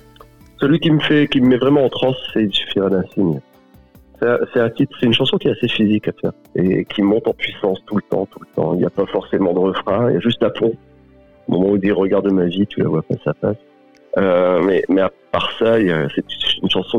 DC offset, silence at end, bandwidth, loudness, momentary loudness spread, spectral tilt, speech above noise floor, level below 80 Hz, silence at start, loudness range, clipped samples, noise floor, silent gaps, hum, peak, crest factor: 0.4%; 0 s; 7.2 kHz; -17 LUFS; 8 LU; -7.5 dB/octave; 31 dB; -50 dBFS; 0.6 s; 3 LU; under 0.1%; -48 dBFS; none; none; -4 dBFS; 12 dB